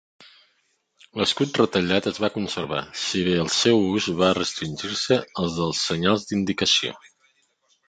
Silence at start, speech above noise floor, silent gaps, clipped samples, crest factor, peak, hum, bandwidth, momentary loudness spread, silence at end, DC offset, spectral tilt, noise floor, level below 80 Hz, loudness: 1.15 s; 46 dB; none; under 0.1%; 20 dB; -4 dBFS; none; 9.4 kHz; 8 LU; 0.9 s; under 0.1%; -4 dB/octave; -69 dBFS; -52 dBFS; -22 LUFS